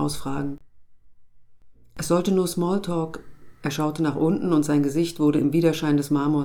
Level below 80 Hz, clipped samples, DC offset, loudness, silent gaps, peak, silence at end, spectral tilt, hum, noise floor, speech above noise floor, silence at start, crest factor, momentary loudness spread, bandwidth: -52 dBFS; under 0.1%; under 0.1%; -23 LUFS; none; -8 dBFS; 0 s; -6.5 dB/octave; none; -48 dBFS; 26 dB; 0 s; 16 dB; 12 LU; 17.5 kHz